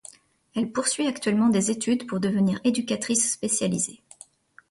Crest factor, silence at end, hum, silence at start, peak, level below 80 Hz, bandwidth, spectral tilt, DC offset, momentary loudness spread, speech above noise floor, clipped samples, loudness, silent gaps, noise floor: 16 dB; 0.8 s; none; 0.55 s; -10 dBFS; -64 dBFS; 11.5 kHz; -4 dB/octave; under 0.1%; 6 LU; 28 dB; under 0.1%; -24 LUFS; none; -52 dBFS